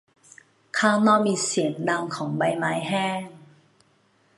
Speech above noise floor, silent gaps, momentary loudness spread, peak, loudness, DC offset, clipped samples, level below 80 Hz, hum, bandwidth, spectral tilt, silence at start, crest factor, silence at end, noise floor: 40 dB; none; 10 LU; -6 dBFS; -23 LUFS; under 0.1%; under 0.1%; -72 dBFS; none; 11.5 kHz; -4.5 dB/octave; 0.75 s; 20 dB; 0.95 s; -63 dBFS